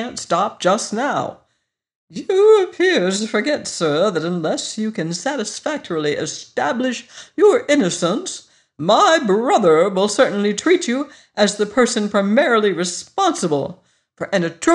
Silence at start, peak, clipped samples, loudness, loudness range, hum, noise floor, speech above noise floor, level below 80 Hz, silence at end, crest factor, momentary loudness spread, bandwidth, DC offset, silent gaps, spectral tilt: 0 s; -2 dBFS; under 0.1%; -18 LUFS; 5 LU; none; -71 dBFS; 54 dB; -64 dBFS; 0 s; 16 dB; 11 LU; 11 kHz; under 0.1%; 1.95-2.08 s; -4 dB/octave